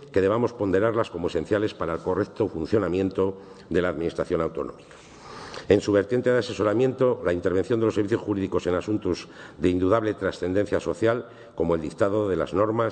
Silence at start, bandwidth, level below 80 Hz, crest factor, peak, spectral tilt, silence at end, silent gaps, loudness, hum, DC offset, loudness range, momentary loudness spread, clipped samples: 0 s; 9.2 kHz; -52 dBFS; 20 dB; -6 dBFS; -7 dB/octave; 0 s; none; -25 LUFS; none; under 0.1%; 3 LU; 7 LU; under 0.1%